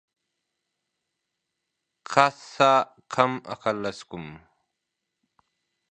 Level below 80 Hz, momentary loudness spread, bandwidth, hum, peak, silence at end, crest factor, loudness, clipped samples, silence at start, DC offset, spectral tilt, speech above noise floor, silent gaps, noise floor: -68 dBFS; 19 LU; 9.6 kHz; none; 0 dBFS; 1.55 s; 28 dB; -24 LUFS; under 0.1%; 2.1 s; under 0.1%; -4.5 dB/octave; 59 dB; none; -83 dBFS